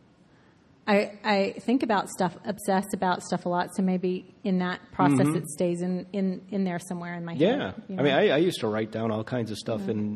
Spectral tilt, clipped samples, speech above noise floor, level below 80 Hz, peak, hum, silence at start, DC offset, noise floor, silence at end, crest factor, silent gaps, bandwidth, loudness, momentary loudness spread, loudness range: -6 dB/octave; under 0.1%; 32 dB; -64 dBFS; -6 dBFS; none; 0.85 s; under 0.1%; -58 dBFS; 0 s; 20 dB; none; 13.5 kHz; -27 LUFS; 9 LU; 1 LU